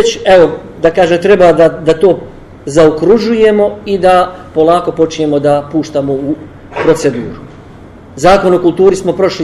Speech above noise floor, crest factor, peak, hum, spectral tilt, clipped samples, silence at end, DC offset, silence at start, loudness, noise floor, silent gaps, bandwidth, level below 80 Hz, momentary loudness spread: 24 dB; 10 dB; 0 dBFS; none; -5.5 dB/octave; 0.7%; 0 s; under 0.1%; 0 s; -10 LUFS; -33 dBFS; none; 12.5 kHz; -38 dBFS; 9 LU